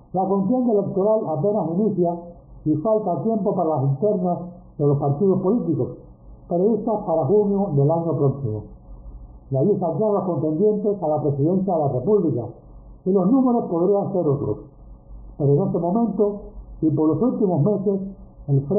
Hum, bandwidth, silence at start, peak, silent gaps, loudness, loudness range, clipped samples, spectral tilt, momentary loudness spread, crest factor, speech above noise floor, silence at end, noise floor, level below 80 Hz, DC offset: none; 1.4 kHz; 0.15 s; -8 dBFS; none; -21 LUFS; 2 LU; under 0.1%; -4.5 dB/octave; 9 LU; 12 dB; 21 dB; 0 s; -41 dBFS; -48 dBFS; under 0.1%